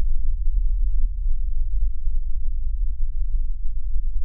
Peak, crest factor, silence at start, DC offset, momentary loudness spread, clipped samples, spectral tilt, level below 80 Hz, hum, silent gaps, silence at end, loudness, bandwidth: -8 dBFS; 10 dB; 0 s; under 0.1%; 4 LU; under 0.1%; -23.5 dB/octave; -20 dBFS; none; none; 0 s; -30 LUFS; 0.2 kHz